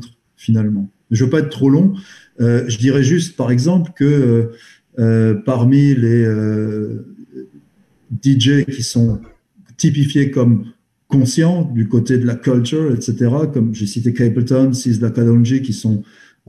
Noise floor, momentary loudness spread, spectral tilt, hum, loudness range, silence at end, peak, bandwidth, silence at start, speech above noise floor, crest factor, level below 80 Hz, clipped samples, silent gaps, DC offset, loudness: -54 dBFS; 9 LU; -7 dB/octave; none; 3 LU; 0.45 s; -2 dBFS; 12 kHz; 0 s; 40 dB; 12 dB; -50 dBFS; under 0.1%; none; under 0.1%; -15 LUFS